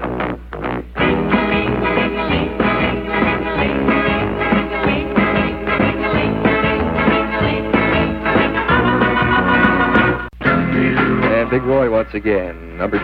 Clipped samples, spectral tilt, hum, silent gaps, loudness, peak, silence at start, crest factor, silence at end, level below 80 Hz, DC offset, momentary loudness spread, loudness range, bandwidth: under 0.1%; -8.5 dB/octave; none; none; -16 LUFS; 0 dBFS; 0 s; 16 dB; 0 s; -32 dBFS; under 0.1%; 5 LU; 2 LU; 5.4 kHz